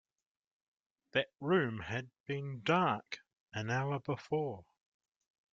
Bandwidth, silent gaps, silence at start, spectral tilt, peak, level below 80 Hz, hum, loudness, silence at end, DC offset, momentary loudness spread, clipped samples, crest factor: 7.6 kHz; 2.20-2.24 s, 3.40-3.46 s; 1.15 s; -6.5 dB/octave; -16 dBFS; -72 dBFS; none; -36 LUFS; 0.9 s; under 0.1%; 12 LU; under 0.1%; 22 dB